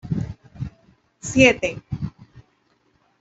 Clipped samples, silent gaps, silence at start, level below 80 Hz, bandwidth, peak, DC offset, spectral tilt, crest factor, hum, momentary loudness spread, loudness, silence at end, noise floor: under 0.1%; none; 0.05 s; -46 dBFS; 8.2 kHz; -2 dBFS; under 0.1%; -5 dB/octave; 24 dB; none; 20 LU; -20 LUFS; 0.8 s; -64 dBFS